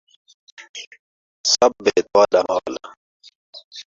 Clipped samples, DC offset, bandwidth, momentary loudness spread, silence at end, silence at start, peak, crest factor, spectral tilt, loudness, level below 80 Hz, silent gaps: under 0.1%; under 0.1%; 7.8 kHz; 21 LU; 0.05 s; 0.6 s; -2 dBFS; 20 dB; -1.5 dB/octave; -18 LUFS; -62 dBFS; 0.69-0.74 s, 0.87-0.91 s, 0.99-1.44 s, 2.97-3.20 s, 3.35-3.53 s, 3.64-3.71 s